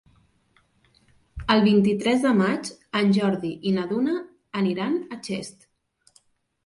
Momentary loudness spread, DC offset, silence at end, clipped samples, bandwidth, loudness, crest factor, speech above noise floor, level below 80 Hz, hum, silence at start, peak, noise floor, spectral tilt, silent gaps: 13 LU; under 0.1%; 1.15 s; under 0.1%; 11.5 kHz; -23 LUFS; 18 dB; 43 dB; -52 dBFS; none; 1.35 s; -6 dBFS; -65 dBFS; -6 dB/octave; none